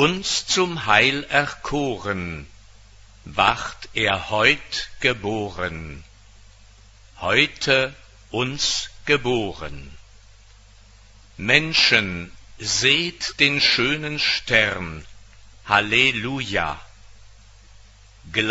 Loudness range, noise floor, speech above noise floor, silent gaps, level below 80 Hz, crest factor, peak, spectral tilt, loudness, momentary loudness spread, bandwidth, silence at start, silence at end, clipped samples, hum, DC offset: 6 LU; -49 dBFS; 27 dB; none; -46 dBFS; 24 dB; 0 dBFS; -3 dB/octave; -20 LUFS; 14 LU; 8 kHz; 0 s; 0 s; under 0.1%; none; under 0.1%